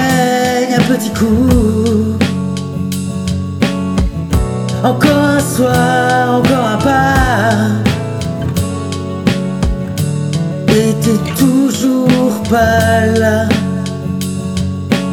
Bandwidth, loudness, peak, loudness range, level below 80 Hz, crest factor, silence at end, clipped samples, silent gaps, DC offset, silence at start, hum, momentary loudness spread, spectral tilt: 18.5 kHz; -13 LUFS; 0 dBFS; 4 LU; -28 dBFS; 12 dB; 0 s; under 0.1%; none; under 0.1%; 0 s; none; 8 LU; -6 dB/octave